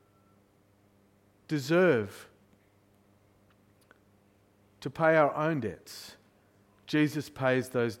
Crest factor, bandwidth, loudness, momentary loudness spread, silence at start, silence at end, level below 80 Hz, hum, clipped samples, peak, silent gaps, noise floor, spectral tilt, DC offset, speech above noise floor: 22 dB; 16.5 kHz; -28 LUFS; 20 LU; 1.5 s; 0.05 s; -70 dBFS; none; under 0.1%; -10 dBFS; none; -65 dBFS; -6.5 dB/octave; under 0.1%; 37 dB